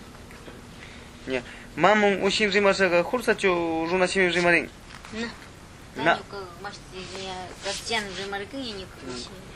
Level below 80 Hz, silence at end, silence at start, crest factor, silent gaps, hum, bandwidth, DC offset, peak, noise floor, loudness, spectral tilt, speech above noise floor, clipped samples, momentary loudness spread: -52 dBFS; 0 s; 0 s; 22 dB; none; none; 14 kHz; under 0.1%; -4 dBFS; -45 dBFS; -24 LUFS; -4 dB/octave; 20 dB; under 0.1%; 23 LU